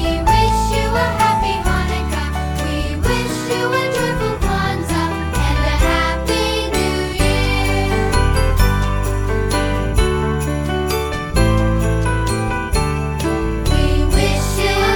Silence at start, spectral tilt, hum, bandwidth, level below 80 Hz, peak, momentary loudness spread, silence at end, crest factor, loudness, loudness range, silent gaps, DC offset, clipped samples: 0 s; -5 dB/octave; none; 19.5 kHz; -20 dBFS; -2 dBFS; 5 LU; 0 s; 14 dB; -18 LUFS; 2 LU; none; under 0.1%; under 0.1%